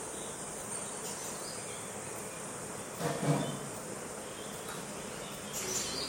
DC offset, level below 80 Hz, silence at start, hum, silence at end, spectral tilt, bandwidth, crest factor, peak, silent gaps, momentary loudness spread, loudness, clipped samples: under 0.1%; -64 dBFS; 0 s; none; 0 s; -3.5 dB/octave; 17 kHz; 20 dB; -18 dBFS; none; 8 LU; -38 LUFS; under 0.1%